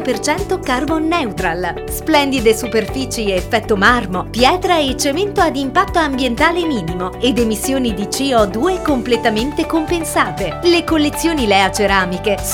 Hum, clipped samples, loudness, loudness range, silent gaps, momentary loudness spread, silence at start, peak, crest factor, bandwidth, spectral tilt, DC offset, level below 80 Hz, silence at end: none; under 0.1%; -16 LUFS; 2 LU; none; 6 LU; 0 s; 0 dBFS; 16 dB; 18 kHz; -4 dB/octave; under 0.1%; -32 dBFS; 0 s